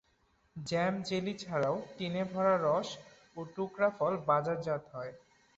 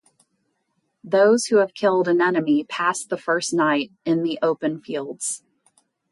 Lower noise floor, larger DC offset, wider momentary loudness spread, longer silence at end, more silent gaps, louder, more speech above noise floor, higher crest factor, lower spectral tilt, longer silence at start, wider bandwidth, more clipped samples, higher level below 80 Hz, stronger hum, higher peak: about the same, -72 dBFS vs -72 dBFS; neither; first, 16 LU vs 10 LU; second, 0.4 s vs 0.75 s; neither; second, -33 LUFS vs -21 LUFS; second, 39 dB vs 52 dB; about the same, 18 dB vs 16 dB; first, -6 dB/octave vs -4 dB/octave; second, 0.55 s vs 1.05 s; second, 8.2 kHz vs 11.5 kHz; neither; about the same, -70 dBFS vs -74 dBFS; neither; second, -16 dBFS vs -6 dBFS